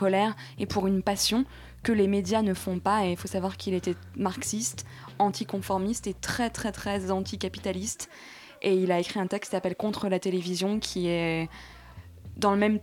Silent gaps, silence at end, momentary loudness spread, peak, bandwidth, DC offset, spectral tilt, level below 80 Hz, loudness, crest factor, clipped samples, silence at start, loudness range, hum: none; 0 s; 12 LU; -10 dBFS; 17 kHz; under 0.1%; -4.5 dB/octave; -52 dBFS; -28 LUFS; 18 dB; under 0.1%; 0 s; 3 LU; none